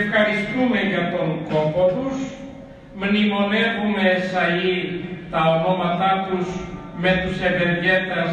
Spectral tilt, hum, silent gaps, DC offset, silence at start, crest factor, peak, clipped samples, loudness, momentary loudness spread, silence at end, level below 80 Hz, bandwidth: -6.5 dB/octave; none; none; under 0.1%; 0 s; 16 dB; -4 dBFS; under 0.1%; -20 LUFS; 10 LU; 0 s; -46 dBFS; 8.8 kHz